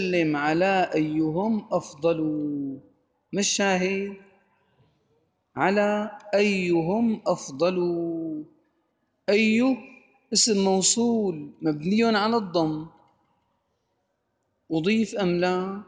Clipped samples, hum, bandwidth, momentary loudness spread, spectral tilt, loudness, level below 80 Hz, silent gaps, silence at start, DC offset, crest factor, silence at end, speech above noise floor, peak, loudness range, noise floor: under 0.1%; none; 10 kHz; 11 LU; -4 dB/octave; -24 LUFS; -66 dBFS; none; 0 s; under 0.1%; 18 dB; 0.05 s; 51 dB; -6 dBFS; 5 LU; -75 dBFS